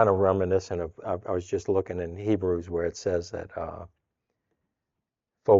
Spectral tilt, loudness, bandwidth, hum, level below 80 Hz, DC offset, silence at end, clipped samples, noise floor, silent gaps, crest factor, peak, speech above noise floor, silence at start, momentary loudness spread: -7 dB/octave; -29 LUFS; 7.8 kHz; none; -58 dBFS; under 0.1%; 0 s; under 0.1%; -86 dBFS; none; 22 dB; -6 dBFS; 58 dB; 0 s; 13 LU